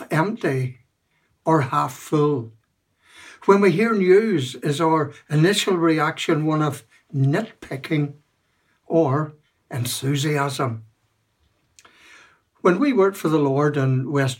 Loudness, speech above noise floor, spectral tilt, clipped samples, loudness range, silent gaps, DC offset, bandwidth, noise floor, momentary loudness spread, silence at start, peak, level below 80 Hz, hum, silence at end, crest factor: -21 LUFS; 48 dB; -6 dB/octave; under 0.1%; 6 LU; none; under 0.1%; 17 kHz; -68 dBFS; 12 LU; 0 s; -2 dBFS; -68 dBFS; none; 0.05 s; 20 dB